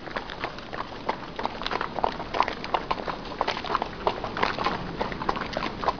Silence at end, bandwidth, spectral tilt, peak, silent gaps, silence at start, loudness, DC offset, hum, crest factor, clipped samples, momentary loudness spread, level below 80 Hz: 0 s; 5.4 kHz; -5 dB/octave; -4 dBFS; none; 0 s; -30 LUFS; 0.4%; none; 24 dB; under 0.1%; 7 LU; -46 dBFS